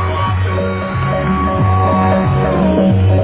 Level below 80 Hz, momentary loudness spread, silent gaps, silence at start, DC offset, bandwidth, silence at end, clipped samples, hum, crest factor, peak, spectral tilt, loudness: -24 dBFS; 5 LU; none; 0 s; under 0.1%; 4 kHz; 0 s; under 0.1%; none; 12 dB; 0 dBFS; -12 dB/octave; -14 LUFS